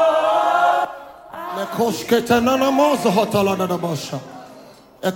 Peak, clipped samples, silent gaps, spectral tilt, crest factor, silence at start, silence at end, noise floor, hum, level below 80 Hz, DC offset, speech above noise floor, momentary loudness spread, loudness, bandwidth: -2 dBFS; under 0.1%; none; -5 dB/octave; 16 dB; 0 s; 0 s; -44 dBFS; none; -56 dBFS; under 0.1%; 26 dB; 16 LU; -18 LUFS; 17 kHz